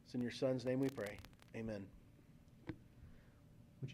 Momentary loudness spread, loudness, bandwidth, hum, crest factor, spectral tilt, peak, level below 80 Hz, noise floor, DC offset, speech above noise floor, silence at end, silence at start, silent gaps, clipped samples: 26 LU; -44 LUFS; 16 kHz; none; 18 dB; -6.5 dB/octave; -26 dBFS; -68 dBFS; -64 dBFS; under 0.1%; 22 dB; 0 s; 0.05 s; none; under 0.1%